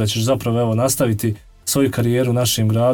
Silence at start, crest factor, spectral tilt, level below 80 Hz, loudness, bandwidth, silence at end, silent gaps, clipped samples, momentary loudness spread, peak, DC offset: 0 s; 12 dB; -5 dB/octave; -48 dBFS; -18 LUFS; 19 kHz; 0 s; none; under 0.1%; 5 LU; -6 dBFS; 0.2%